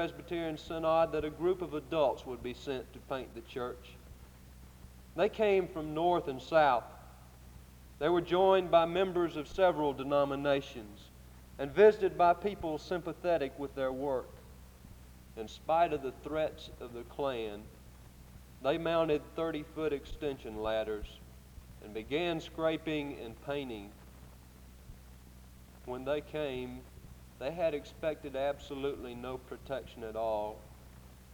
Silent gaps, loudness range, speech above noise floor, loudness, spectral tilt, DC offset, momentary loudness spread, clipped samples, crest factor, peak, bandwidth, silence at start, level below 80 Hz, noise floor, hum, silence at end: none; 9 LU; 21 dB; -33 LUFS; -6 dB/octave; under 0.1%; 23 LU; under 0.1%; 22 dB; -12 dBFS; over 20 kHz; 0 s; -56 dBFS; -54 dBFS; none; 0 s